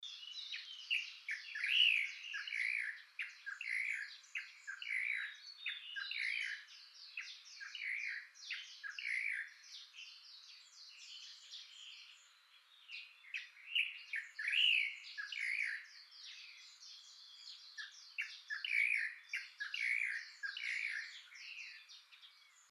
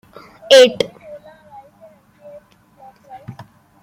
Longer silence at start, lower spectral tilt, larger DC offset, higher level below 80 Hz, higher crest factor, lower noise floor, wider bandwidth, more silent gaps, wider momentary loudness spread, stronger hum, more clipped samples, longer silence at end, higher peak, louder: second, 0 s vs 0.5 s; second, 8.5 dB/octave vs -2.5 dB/octave; neither; second, under -90 dBFS vs -62 dBFS; about the same, 22 dB vs 18 dB; first, -67 dBFS vs -47 dBFS; second, 13 kHz vs 15.5 kHz; neither; second, 19 LU vs 29 LU; neither; neither; second, 0.1 s vs 0.5 s; second, -20 dBFS vs 0 dBFS; second, -39 LUFS vs -12 LUFS